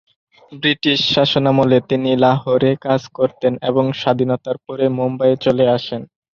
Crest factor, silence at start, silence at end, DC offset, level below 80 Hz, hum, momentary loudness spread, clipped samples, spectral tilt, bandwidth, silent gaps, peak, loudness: 16 dB; 0.5 s; 0.35 s; under 0.1%; -54 dBFS; none; 6 LU; under 0.1%; -6.5 dB/octave; 7 kHz; none; 0 dBFS; -16 LUFS